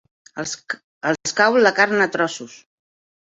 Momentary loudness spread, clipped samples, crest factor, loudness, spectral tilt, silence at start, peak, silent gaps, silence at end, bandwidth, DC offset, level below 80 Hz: 18 LU; under 0.1%; 20 dB; -19 LUFS; -3 dB/octave; 0.35 s; -2 dBFS; 0.84-1.01 s; 0.7 s; 8.2 kHz; under 0.1%; -68 dBFS